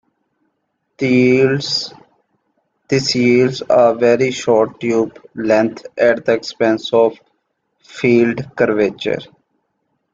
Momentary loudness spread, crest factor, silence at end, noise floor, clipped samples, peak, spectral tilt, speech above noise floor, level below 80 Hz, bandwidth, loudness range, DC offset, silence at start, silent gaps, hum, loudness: 9 LU; 16 dB; 0.9 s; -70 dBFS; under 0.1%; 0 dBFS; -5.5 dB/octave; 55 dB; -58 dBFS; 7.8 kHz; 3 LU; under 0.1%; 1 s; none; none; -15 LUFS